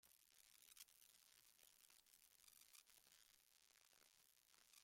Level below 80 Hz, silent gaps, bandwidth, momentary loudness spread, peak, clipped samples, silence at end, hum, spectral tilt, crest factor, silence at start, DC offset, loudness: under -90 dBFS; none; 16.5 kHz; 5 LU; -46 dBFS; under 0.1%; 0 s; none; 1.5 dB/octave; 28 dB; 0 s; under 0.1%; -67 LUFS